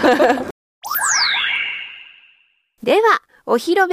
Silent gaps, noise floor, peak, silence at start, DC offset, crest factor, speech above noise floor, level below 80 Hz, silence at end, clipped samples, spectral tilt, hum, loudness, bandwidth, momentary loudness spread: 0.51-0.82 s; -59 dBFS; -2 dBFS; 0 s; under 0.1%; 16 dB; 44 dB; -58 dBFS; 0 s; under 0.1%; -1.5 dB/octave; none; -17 LUFS; 15.5 kHz; 17 LU